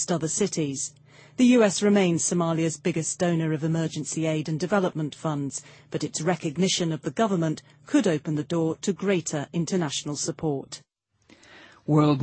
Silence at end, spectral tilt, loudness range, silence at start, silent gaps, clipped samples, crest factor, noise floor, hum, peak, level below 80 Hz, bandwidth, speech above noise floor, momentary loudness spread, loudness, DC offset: 0 s; -5 dB/octave; 5 LU; 0 s; none; under 0.1%; 18 dB; -59 dBFS; none; -8 dBFS; -64 dBFS; 8.8 kHz; 35 dB; 11 LU; -25 LUFS; under 0.1%